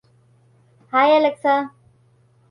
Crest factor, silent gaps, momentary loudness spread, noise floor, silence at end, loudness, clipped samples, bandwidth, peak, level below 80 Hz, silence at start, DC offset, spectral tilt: 16 dB; none; 7 LU; -57 dBFS; 0.85 s; -18 LUFS; under 0.1%; 11 kHz; -4 dBFS; -72 dBFS; 0.95 s; under 0.1%; -5.5 dB/octave